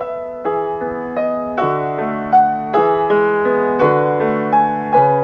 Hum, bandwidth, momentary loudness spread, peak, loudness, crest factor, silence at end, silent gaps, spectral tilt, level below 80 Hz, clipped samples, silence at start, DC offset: none; 6 kHz; 8 LU; -2 dBFS; -16 LUFS; 14 dB; 0 s; none; -9 dB/octave; -52 dBFS; under 0.1%; 0 s; under 0.1%